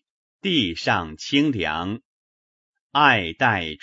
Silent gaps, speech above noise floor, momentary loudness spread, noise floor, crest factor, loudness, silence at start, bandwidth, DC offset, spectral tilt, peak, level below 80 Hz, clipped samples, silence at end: 2.05-2.74 s, 2.80-2.90 s; over 69 dB; 12 LU; under -90 dBFS; 22 dB; -21 LUFS; 0.45 s; 8 kHz; under 0.1%; -5 dB/octave; -2 dBFS; -52 dBFS; under 0.1%; 0.05 s